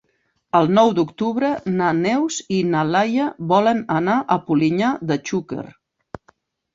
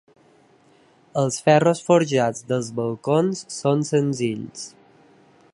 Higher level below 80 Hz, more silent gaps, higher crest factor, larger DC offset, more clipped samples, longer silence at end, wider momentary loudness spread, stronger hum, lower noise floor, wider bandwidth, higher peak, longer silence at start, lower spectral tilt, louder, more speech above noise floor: first, -60 dBFS vs -68 dBFS; neither; about the same, 18 dB vs 20 dB; neither; neither; first, 1.05 s vs 0.85 s; second, 7 LU vs 13 LU; neither; first, -68 dBFS vs -56 dBFS; second, 7.8 kHz vs 11.5 kHz; about the same, -2 dBFS vs -2 dBFS; second, 0.55 s vs 1.15 s; about the same, -6 dB/octave vs -5.5 dB/octave; about the same, -19 LUFS vs -21 LUFS; first, 49 dB vs 35 dB